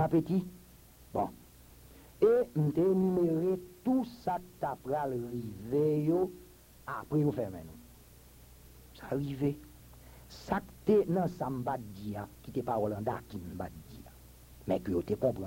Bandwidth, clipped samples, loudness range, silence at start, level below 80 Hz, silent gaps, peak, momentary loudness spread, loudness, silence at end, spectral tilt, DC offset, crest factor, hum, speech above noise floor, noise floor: 16.5 kHz; under 0.1%; 7 LU; 0 s; -58 dBFS; none; -14 dBFS; 18 LU; -33 LUFS; 0 s; -8.5 dB/octave; under 0.1%; 18 dB; none; 25 dB; -56 dBFS